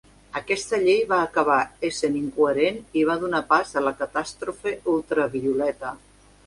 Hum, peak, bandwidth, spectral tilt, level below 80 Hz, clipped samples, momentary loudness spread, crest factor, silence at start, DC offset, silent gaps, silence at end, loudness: none; -6 dBFS; 11.5 kHz; -4.5 dB/octave; -56 dBFS; under 0.1%; 9 LU; 18 dB; 0.35 s; under 0.1%; none; 0.5 s; -23 LUFS